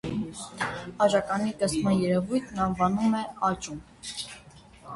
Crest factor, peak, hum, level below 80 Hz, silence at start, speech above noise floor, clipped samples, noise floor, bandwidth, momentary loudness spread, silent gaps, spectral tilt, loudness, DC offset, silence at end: 18 dB; -10 dBFS; none; -54 dBFS; 0.05 s; 24 dB; under 0.1%; -51 dBFS; 11.5 kHz; 13 LU; none; -5.5 dB/octave; -27 LUFS; under 0.1%; 0 s